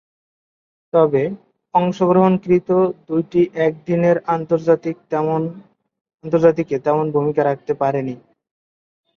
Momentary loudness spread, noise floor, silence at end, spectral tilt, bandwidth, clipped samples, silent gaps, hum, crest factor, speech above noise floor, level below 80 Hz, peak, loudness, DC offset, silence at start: 8 LU; under -90 dBFS; 1 s; -9 dB/octave; 7 kHz; under 0.1%; 6.01-6.05 s; none; 16 dB; over 73 dB; -60 dBFS; -2 dBFS; -18 LUFS; under 0.1%; 0.95 s